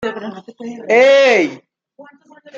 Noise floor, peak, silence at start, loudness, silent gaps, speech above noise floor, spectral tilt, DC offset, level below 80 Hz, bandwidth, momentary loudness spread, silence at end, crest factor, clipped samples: -44 dBFS; -2 dBFS; 0 s; -12 LUFS; none; 30 dB; -3.5 dB/octave; under 0.1%; -64 dBFS; 7.6 kHz; 22 LU; 0 s; 14 dB; under 0.1%